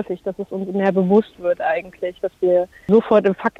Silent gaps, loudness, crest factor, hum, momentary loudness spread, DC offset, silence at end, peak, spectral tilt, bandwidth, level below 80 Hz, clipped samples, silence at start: none; -19 LUFS; 16 dB; none; 12 LU; under 0.1%; 0.1 s; -4 dBFS; -8.5 dB/octave; 7.2 kHz; -56 dBFS; under 0.1%; 0 s